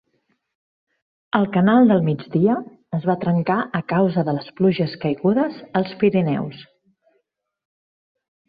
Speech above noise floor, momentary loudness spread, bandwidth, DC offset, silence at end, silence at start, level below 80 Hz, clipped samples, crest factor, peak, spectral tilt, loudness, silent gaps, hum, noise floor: 52 dB; 9 LU; 5 kHz; under 0.1%; 1.85 s; 1.35 s; -60 dBFS; under 0.1%; 18 dB; -4 dBFS; -11.5 dB/octave; -20 LUFS; none; none; -71 dBFS